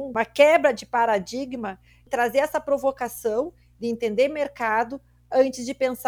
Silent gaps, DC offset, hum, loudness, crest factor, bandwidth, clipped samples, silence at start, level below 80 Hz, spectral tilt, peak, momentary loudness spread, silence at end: none; under 0.1%; none; -23 LUFS; 20 dB; over 20 kHz; under 0.1%; 0 s; -58 dBFS; -4 dB/octave; -4 dBFS; 13 LU; 0 s